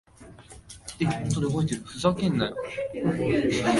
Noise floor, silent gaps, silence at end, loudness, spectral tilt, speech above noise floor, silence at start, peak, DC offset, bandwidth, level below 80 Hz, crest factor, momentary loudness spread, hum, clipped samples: -48 dBFS; none; 0 s; -27 LUFS; -6 dB/octave; 23 dB; 0.2 s; -8 dBFS; under 0.1%; 11.5 kHz; -50 dBFS; 18 dB; 17 LU; none; under 0.1%